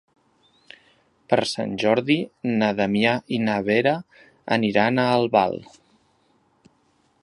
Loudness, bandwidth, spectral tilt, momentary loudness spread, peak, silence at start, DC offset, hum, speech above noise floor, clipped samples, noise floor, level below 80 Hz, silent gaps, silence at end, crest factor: -22 LUFS; 11.5 kHz; -6 dB/octave; 7 LU; -2 dBFS; 1.3 s; under 0.1%; none; 42 dB; under 0.1%; -64 dBFS; -62 dBFS; none; 1.6 s; 20 dB